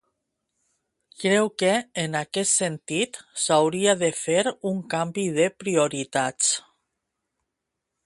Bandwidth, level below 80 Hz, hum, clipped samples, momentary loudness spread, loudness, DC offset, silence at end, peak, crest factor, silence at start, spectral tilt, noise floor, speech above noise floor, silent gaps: 11.5 kHz; -68 dBFS; none; under 0.1%; 7 LU; -23 LUFS; under 0.1%; 1.45 s; -6 dBFS; 20 dB; 1.2 s; -3 dB/octave; -83 dBFS; 59 dB; none